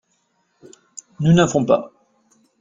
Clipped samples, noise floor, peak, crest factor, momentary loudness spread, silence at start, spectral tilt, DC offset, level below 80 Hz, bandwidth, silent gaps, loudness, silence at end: under 0.1%; -67 dBFS; -2 dBFS; 20 dB; 25 LU; 1.2 s; -6.5 dB/octave; under 0.1%; -54 dBFS; 7.6 kHz; none; -17 LUFS; 0.75 s